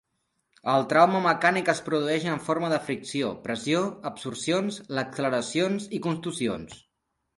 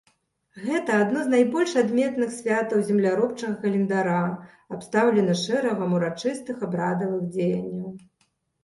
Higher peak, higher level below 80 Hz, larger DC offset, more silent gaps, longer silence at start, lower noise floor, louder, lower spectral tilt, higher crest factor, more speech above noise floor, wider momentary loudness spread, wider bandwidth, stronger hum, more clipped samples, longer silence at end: first, -4 dBFS vs -8 dBFS; about the same, -66 dBFS vs -68 dBFS; neither; neither; about the same, 0.65 s vs 0.55 s; first, -79 dBFS vs -70 dBFS; about the same, -26 LUFS vs -24 LUFS; about the same, -5 dB/octave vs -6 dB/octave; first, 22 dB vs 16 dB; first, 53 dB vs 46 dB; about the same, 11 LU vs 9 LU; about the same, 11.5 kHz vs 11.5 kHz; neither; neither; about the same, 0.6 s vs 0.65 s